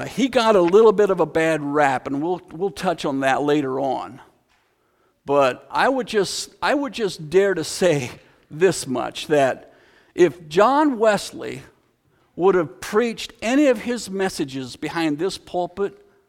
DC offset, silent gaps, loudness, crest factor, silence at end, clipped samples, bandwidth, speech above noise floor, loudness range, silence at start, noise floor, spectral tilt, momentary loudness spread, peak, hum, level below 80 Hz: under 0.1%; none; -20 LUFS; 20 dB; 0.4 s; under 0.1%; 16 kHz; 44 dB; 4 LU; 0 s; -64 dBFS; -4.5 dB/octave; 12 LU; -2 dBFS; none; -56 dBFS